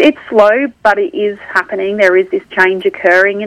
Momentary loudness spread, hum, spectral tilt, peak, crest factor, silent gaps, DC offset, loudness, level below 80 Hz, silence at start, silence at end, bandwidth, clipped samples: 7 LU; none; -5 dB/octave; 0 dBFS; 12 dB; none; under 0.1%; -12 LUFS; -54 dBFS; 0 s; 0 s; 11 kHz; 0.4%